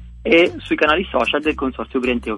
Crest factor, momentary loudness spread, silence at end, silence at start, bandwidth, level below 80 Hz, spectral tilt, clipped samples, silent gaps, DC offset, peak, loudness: 18 dB; 8 LU; 0 s; 0 s; 11 kHz; -38 dBFS; -5.5 dB/octave; under 0.1%; none; under 0.1%; 0 dBFS; -18 LUFS